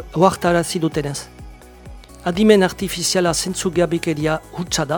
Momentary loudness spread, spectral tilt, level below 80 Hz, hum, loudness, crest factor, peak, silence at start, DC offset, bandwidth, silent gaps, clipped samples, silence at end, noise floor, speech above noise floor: 11 LU; -4.5 dB/octave; -42 dBFS; none; -18 LUFS; 20 dB; 0 dBFS; 0 s; under 0.1%; 19 kHz; none; under 0.1%; 0 s; -39 dBFS; 21 dB